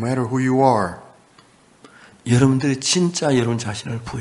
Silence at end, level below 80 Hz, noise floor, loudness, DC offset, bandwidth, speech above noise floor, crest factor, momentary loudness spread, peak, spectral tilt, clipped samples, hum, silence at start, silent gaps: 0 s; -50 dBFS; -52 dBFS; -19 LUFS; under 0.1%; 11.5 kHz; 33 dB; 18 dB; 12 LU; -2 dBFS; -5 dB/octave; under 0.1%; none; 0 s; none